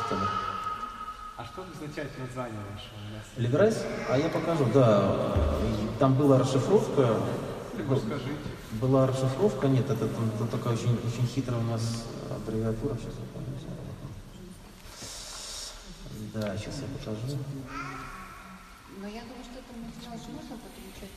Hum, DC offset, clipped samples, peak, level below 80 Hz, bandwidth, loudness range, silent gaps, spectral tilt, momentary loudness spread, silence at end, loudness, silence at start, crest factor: none; under 0.1%; under 0.1%; -8 dBFS; -46 dBFS; 14.5 kHz; 14 LU; none; -6.5 dB/octave; 19 LU; 0 s; -29 LUFS; 0 s; 22 dB